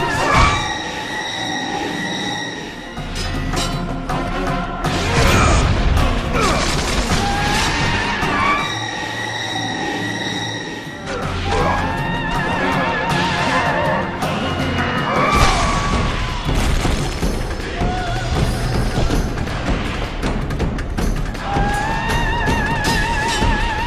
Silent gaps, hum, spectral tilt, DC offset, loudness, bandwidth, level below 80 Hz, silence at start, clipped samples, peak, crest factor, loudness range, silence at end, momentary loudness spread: none; none; -4.5 dB/octave; under 0.1%; -19 LUFS; 15 kHz; -24 dBFS; 0 s; under 0.1%; 0 dBFS; 18 dB; 5 LU; 0 s; 8 LU